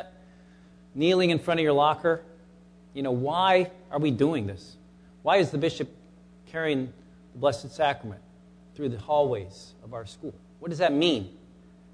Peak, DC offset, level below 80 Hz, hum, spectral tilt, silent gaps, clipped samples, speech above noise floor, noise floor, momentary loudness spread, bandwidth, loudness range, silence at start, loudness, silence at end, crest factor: -8 dBFS; under 0.1%; -60 dBFS; 60 Hz at -55 dBFS; -6 dB/octave; none; under 0.1%; 27 dB; -53 dBFS; 19 LU; 11 kHz; 6 LU; 0 s; -26 LUFS; 0.65 s; 18 dB